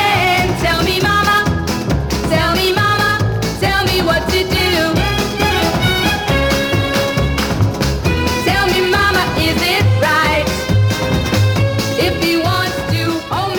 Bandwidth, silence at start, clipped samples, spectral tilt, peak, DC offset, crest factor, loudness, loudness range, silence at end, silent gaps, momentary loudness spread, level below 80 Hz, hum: over 20 kHz; 0 s; under 0.1%; -5 dB/octave; 0 dBFS; under 0.1%; 14 dB; -14 LUFS; 1 LU; 0 s; none; 4 LU; -28 dBFS; none